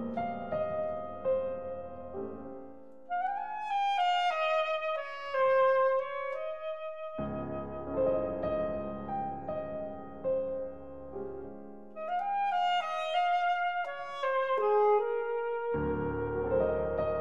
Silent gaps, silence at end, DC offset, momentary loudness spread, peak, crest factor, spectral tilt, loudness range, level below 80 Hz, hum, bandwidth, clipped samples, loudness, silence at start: none; 0 s; 0.3%; 14 LU; -16 dBFS; 16 dB; -6 dB/octave; 7 LU; -56 dBFS; none; 7.6 kHz; under 0.1%; -32 LUFS; 0 s